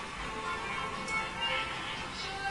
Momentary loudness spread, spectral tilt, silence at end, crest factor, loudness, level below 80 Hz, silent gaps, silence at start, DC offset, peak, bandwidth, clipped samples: 5 LU; -2.5 dB/octave; 0 s; 16 dB; -34 LUFS; -52 dBFS; none; 0 s; under 0.1%; -22 dBFS; 11.5 kHz; under 0.1%